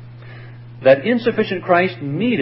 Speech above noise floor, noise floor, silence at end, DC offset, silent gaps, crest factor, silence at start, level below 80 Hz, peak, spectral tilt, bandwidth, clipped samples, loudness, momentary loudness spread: 20 dB; -36 dBFS; 0 s; under 0.1%; none; 18 dB; 0 s; -58 dBFS; 0 dBFS; -11 dB/octave; 5.8 kHz; under 0.1%; -17 LUFS; 23 LU